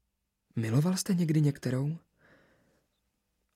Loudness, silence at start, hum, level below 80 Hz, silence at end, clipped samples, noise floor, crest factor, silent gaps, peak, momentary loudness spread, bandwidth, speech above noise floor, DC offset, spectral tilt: -30 LUFS; 0.55 s; none; -70 dBFS; 1.55 s; under 0.1%; -81 dBFS; 16 dB; none; -16 dBFS; 10 LU; 15.5 kHz; 53 dB; under 0.1%; -6.5 dB/octave